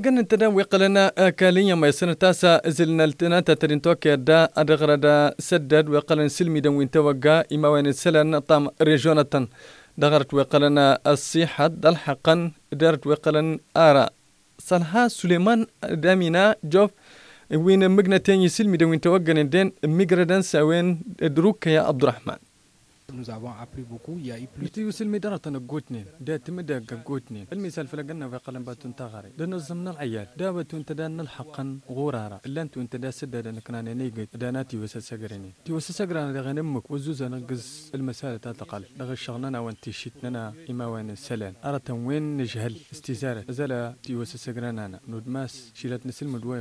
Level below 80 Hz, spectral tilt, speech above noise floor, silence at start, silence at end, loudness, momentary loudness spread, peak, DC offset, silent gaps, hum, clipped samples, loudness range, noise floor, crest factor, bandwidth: -64 dBFS; -6 dB/octave; 36 dB; 0 s; 0 s; -21 LUFS; 18 LU; -4 dBFS; under 0.1%; none; none; under 0.1%; 14 LU; -59 dBFS; 18 dB; 11 kHz